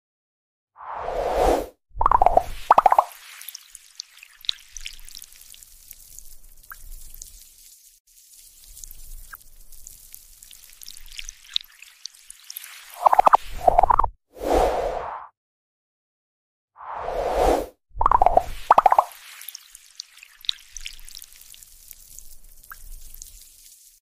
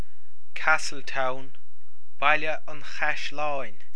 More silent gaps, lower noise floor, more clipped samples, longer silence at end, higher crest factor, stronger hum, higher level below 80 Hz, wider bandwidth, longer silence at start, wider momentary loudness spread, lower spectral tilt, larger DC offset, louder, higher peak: first, 8.00-8.05 s, 15.37-16.68 s vs none; second, -51 dBFS vs -64 dBFS; neither; first, 0.8 s vs 0.25 s; about the same, 24 dB vs 24 dB; neither; first, -38 dBFS vs -66 dBFS; first, 16 kHz vs 11 kHz; first, 0.8 s vs 0.55 s; first, 26 LU vs 13 LU; about the same, -3.5 dB/octave vs -3 dB/octave; second, under 0.1% vs 10%; first, -21 LUFS vs -27 LUFS; first, 0 dBFS vs -6 dBFS